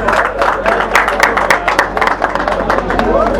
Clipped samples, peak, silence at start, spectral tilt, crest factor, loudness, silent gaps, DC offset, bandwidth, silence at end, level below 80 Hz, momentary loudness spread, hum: 0.3%; 0 dBFS; 0 s; -4 dB/octave; 12 dB; -12 LUFS; none; under 0.1%; over 20 kHz; 0 s; -28 dBFS; 4 LU; none